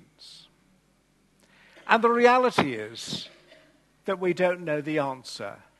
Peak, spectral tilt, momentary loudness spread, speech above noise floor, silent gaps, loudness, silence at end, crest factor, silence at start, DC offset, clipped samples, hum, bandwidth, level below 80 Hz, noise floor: -4 dBFS; -5 dB/octave; 21 LU; 41 dB; none; -25 LUFS; 0.3 s; 24 dB; 0.2 s; under 0.1%; under 0.1%; 50 Hz at -65 dBFS; 12.5 kHz; -70 dBFS; -65 dBFS